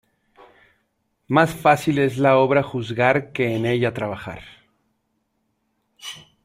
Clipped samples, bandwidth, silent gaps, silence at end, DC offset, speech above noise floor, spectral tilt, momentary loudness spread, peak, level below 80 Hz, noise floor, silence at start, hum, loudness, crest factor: under 0.1%; 16 kHz; none; 0.25 s; under 0.1%; 52 dB; -6.5 dB/octave; 19 LU; -2 dBFS; -58 dBFS; -71 dBFS; 1.3 s; none; -20 LUFS; 20 dB